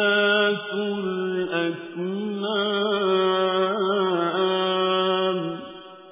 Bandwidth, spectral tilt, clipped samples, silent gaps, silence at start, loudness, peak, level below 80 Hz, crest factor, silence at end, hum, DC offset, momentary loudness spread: 3.8 kHz; -9 dB/octave; under 0.1%; none; 0 s; -23 LUFS; -10 dBFS; -70 dBFS; 14 dB; 0 s; none; under 0.1%; 8 LU